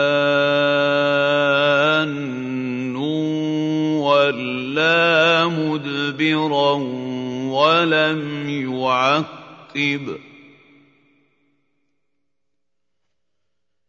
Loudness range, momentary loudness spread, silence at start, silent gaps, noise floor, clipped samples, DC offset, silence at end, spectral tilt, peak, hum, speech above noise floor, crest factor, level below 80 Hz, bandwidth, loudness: 7 LU; 10 LU; 0 s; none; -81 dBFS; under 0.1%; under 0.1%; 3.6 s; -5.5 dB/octave; -4 dBFS; none; 62 dB; 18 dB; -68 dBFS; 7.6 kHz; -18 LUFS